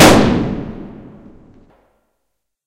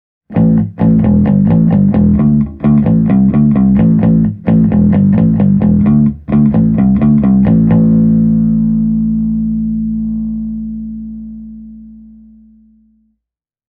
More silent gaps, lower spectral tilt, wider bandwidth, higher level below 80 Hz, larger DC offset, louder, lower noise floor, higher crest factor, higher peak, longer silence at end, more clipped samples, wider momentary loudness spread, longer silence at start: neither; second, -4.5 dB/octave vs -13.5 dB/octave; first, 16 kHz vs 3 kHz; second, -34 dBFS vs -28 dBFS; neither; second, -14 LUFS vs -11 LUFS; second, -74 dBFS vs -80 dBFS; first, 16 dB vs 10 dB; about the same, 0 dBFS vs 0 dBFS; about the same, 1.75 s vs 1.85 s; first, 0.4% vs under 0.1%; first, 25 LU vs 11 LU; second, 0 s vs 0.3 s